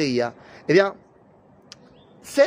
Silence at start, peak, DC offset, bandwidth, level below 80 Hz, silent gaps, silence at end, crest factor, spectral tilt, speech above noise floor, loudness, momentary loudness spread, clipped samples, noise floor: 0 s; -4 dBFS; under 0.1%; 15.5 kHz; -66 dBFS; none; 0 s; 20 dB; -5 dB/octave; 32 dB; -22 LUFS; 16 LU; under 0.1%; -54 dBFS